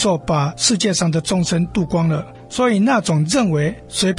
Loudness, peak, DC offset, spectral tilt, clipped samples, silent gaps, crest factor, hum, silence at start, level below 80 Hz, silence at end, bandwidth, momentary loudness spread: -18 LUFS; -2 dBFS; under 0.1%; -4.5 dB/octave; under 0.1%; none; 16 dB; none; 0 s; -44 dBFS; 0 s; 11.5 kHz; 5 LU